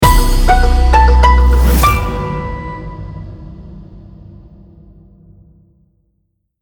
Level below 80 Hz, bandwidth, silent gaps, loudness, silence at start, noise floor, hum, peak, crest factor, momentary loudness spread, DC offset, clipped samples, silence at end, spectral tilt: -14 dBFS; 20 kHz; none; -12 LUFS; 0 s; -65 dBFS; none; 0 dBFS; 12 dB; 24 LU; under 0.1%; under 0.1%; 2.6 s; -5.5 dB/octave